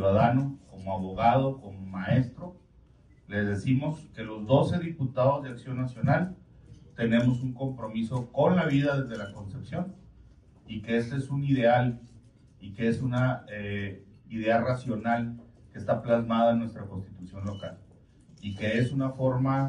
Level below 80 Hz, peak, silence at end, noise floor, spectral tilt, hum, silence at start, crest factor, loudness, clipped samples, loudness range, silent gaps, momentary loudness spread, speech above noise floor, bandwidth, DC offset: -56 dBFS; -10 dBFS; 0 s; -57 dBFS; -8.5 dB/octave; none; 0 s; 20 dB; -28 LUFS; under 0.1%; 2 LU; none; 16 LU; 30 dB; 9.8 kHz; under 0.1%